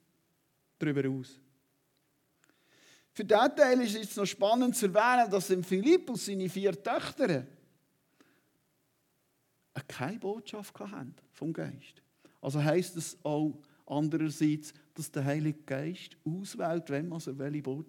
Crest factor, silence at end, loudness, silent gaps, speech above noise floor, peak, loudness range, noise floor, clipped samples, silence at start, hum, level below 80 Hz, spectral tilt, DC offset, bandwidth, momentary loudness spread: 22 dB; 0.05 s; -31 LUFS; none; 44 dB; -10 dBFS; 14 LU; -75 dBFS; under 0.1%; 0.8 s; none; -82 dBFS; -5.5 dB/octave; under 0.1%; 18 kHz; 18 LU